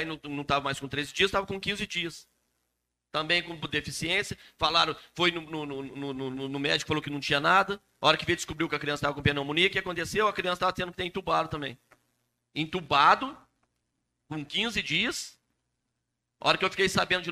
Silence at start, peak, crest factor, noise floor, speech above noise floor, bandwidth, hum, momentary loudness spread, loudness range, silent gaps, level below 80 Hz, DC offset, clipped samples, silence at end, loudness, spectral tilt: 0 s; -6 dBFS; 24 dB; -82 dBFS; 54 dB; 15 kHz; none; 12 LU; 4 LU; none; -56 dBFS; under 0.1%; under 0.1%; 0 s; -28 LUFS; -3.5 dB/octave